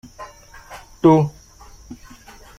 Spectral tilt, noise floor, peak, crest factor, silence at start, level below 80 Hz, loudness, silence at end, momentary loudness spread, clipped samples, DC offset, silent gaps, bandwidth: -8 dB/octave; -44 dBFS; -2 dBFS; 20 dB; 0.2 s; -48 dBFS; -17 LUFS; 0.65 s; 26 LU; under 0.1%; under 0.1%; none; 13.5 kHz